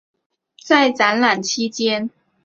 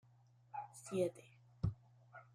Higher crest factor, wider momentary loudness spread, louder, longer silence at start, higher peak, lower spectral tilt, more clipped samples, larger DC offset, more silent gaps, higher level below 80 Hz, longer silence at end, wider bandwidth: about the same, 18 dB vs 20 dB; second, 8 LU vs 21 LU; first, -17 LUFS vs -44 LUFS; about the same, 0.65 s vs 0.55 s; first, -2 dBFS vs -26 dBFS; second, -2.5 dB/octave vs -7 dB/octave; neither; neither; neither; about the same, -66 dBFS vs -64 dBFS; first, 0.35 s vs 0.1 s; second, 8 kHz vs 15 kHz